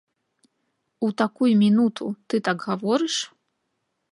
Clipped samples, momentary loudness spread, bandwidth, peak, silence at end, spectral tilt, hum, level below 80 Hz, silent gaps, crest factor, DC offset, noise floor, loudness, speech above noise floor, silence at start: under 0.1%; 10 LU; 11 kHz; -6 dBFS; 0.9 s; -5 dB/octave; none; -74 dBFS; none; 18 dB; under 0.1%; -76 dBFS; -23 LUFS; 54 dB; 1 s